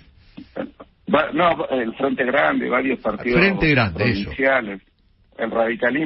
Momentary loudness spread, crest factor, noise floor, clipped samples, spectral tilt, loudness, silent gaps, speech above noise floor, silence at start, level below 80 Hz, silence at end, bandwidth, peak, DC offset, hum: 16 LU; 18 dB; -46 dBFS; under 0.1%; -10.5 dB/octave; -19 LUFS; none; 26 dB; 0.35 s; -44 dBFS; 0 s; 5.8 kHz; -2 dBFS; under 0.1%; none